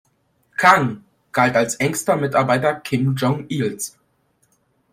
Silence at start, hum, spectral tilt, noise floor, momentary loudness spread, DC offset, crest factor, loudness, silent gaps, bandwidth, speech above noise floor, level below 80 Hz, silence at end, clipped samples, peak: 0.6 s; none; -5 dB/octave; -64 dBFS; 13 LU; under 0.1%; 20 dB; -19 LUFS; none; 16 kHz; 46 dB; -60 dBFS; 1.05 s; under 0.1%; 0 dBFS